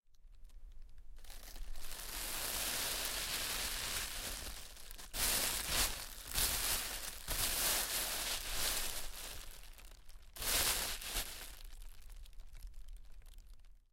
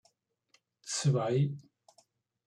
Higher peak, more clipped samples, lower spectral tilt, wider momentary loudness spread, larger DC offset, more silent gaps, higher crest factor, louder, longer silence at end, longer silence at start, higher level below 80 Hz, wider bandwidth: about the same, -18 dBFS vs -18 dBFS; neither; second, -0.5 dB/octave vs -5.5 dB/octave; first, 23 LU vs 18 LU; neither; neither; about the same, 22 dB vs 18 dB; second, -37 LUFS vs -31 LUFS; second, 0.15 s vs 0.85 s; second, 0.1 s vs 0.85 s; first, -50 dBFS vs -76 dBFS; first, 17 kHz vs 11 kHz